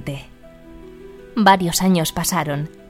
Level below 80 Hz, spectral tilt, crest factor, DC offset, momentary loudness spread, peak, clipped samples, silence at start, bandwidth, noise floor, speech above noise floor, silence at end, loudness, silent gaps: -44 dBFS; -4.5 dB/octave; 20 dB; under 0.1%; 15 LU; 0 dBFS; under 0.1%; 0 s; 16.5 kHz; -41 dBFS; 23 dB; 0.2 s; -18 LUFS; none